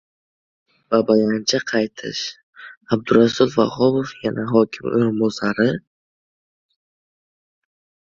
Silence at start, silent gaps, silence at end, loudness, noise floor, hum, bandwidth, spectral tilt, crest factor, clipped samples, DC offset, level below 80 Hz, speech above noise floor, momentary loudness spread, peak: 0.9 s; 2.43-2.53 s, 2.77-2.81 s; 2.35 s; -19 LUFS; under -90 dBFS; none; 7.4 kHz; -5.5 dB/octave; 20 dB; under 0.1%; under 0.1%; -58 dBFS; over 72 dB; 9 LU; -2 dBFS